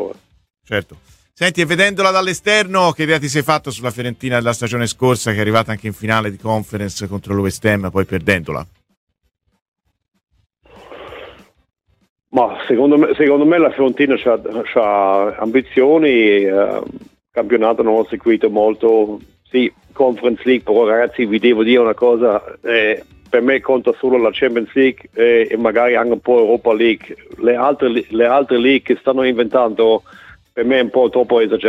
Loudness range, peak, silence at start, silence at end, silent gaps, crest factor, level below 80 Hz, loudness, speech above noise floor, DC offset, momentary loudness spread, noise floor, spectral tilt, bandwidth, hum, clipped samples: 6 LU; 0 dBFS; 0 s; 0 s; 8.97-9.07 s, 9.68-9.72 s, 12.10-12.16 s; 16 dB; -52 dBFS; -15 LUFS; 25 dB; under 0.1%; 10 LU; -40 dBFS; -5.5 dB/octave; 15.5 kHz; none; under 0.1%